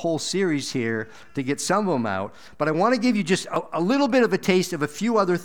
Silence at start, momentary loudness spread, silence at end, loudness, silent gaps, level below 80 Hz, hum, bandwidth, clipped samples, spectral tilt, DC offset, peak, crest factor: 0 s; 8 LU; 0 s; -23 LUFS; none; -66 dBFS; none; 18 kHz; under 0.1%; -5 dB/octave; 0.5%; -6 dBFS; 16 dB